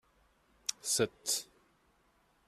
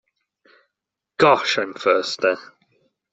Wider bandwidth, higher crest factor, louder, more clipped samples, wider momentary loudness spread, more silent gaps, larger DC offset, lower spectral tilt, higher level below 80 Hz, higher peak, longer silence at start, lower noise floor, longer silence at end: first, 15 kHz vs 8.2 kHz; about the same, 24 dB vs 20 dB; second, -34 LUFS vs -19 LUFS; neither; about the same, 8 LU vs 10 LU; neither; neither; second, -1.5 dB/octave vs -3.5 dB/octave; second, -72 dBFS vs -66 dBFS; second, -16 dBFS vs -2 dBFS; second, 0.7 s vs 1.2 s; second, -71 dBFS vs -84 dBFS; first, 1.05 s vs 0.7 s